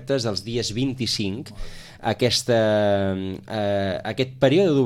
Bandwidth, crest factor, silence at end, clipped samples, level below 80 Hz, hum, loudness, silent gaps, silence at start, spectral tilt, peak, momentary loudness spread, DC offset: 16 kHz; 16 dB; 0 s; under 0.1%; -46 dBFS; none; -23 LUFS; none; 0 s; -5 dB/octave; -6 dBFS; 11 LU; under 0.1%